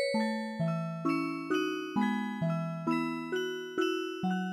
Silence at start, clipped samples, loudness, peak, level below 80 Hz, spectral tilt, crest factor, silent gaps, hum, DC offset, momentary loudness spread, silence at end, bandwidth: 0 s; under 0.1%; -33 LUFS; -18 dBFS; -76 dBFS; -6 dB/octave; 14 dB; none; none; under 0.1%; 3 LU; 0 s; 15 kHz